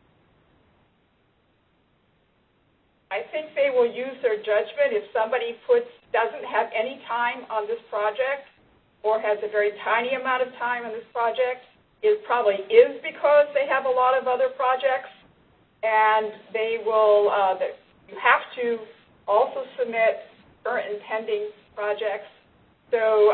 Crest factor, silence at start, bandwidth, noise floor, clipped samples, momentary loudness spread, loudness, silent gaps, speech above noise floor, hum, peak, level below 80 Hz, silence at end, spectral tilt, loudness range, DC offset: 22 dB; 3.1 s; 4.4 kHz; -65 dBFS; under 0.1%; 11 LU; -24 LUFS; none; 42 dB; none; -2 dBFS; -70 dBFS; 0 s; -7 dB/octave; 7 LU; under 0.1%